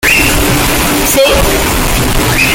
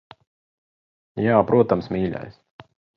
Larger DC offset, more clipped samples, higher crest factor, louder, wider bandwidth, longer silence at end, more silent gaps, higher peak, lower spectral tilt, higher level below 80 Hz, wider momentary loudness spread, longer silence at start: neither; neither; second, 10 dB vs 22 dB; first, -9 LUFS vs -21 LUFS; first, 17.5 kHz vs 6 kHz; second, 0 s vs 0.65 s; neither; about the same, 0 dBFS vs -2 dBFS; second, -3 dB/octave vs -10 dB/octave; first, -18 dBFS vs -52 dBFS; second, 3 LU vs 19 LU; second, 0 s vs 1.15 s